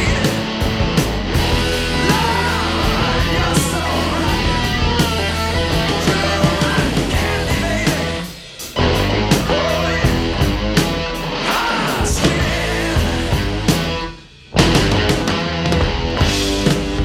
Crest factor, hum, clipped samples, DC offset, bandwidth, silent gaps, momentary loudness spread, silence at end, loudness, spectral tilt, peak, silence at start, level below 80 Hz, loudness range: 16 dB; none; under 0.1%; under 0.1%; 17 kHz; none; 4 LU; 0 s; -17 LUFS; -4.5 dB/octave; 0 dBFS; 0 s; -26 dBFS; 1 LU